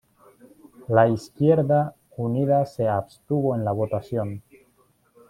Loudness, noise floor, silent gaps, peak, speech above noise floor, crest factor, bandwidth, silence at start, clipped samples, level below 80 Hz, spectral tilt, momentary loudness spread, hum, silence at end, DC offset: -23 LUFS; -63 dBFS; none; -4 dBFS; 41 dB; 20 dB; 13.5 kHz; 0.8 s; under 0.1%; -60 dBFS; -9 dB/octave; 11 LU; none; 0.9 s; under 0.1%